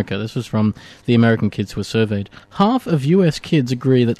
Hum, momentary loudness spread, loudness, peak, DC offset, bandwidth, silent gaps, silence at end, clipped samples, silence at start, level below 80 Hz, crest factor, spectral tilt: none; 9 LU; -18 LUFS; -4 dBFS; under 0.1%; 13.5 kHz; none; 0.05 s; under 0.1%; 0 s; -50 dBFS; 12 dB; -7 dB/octave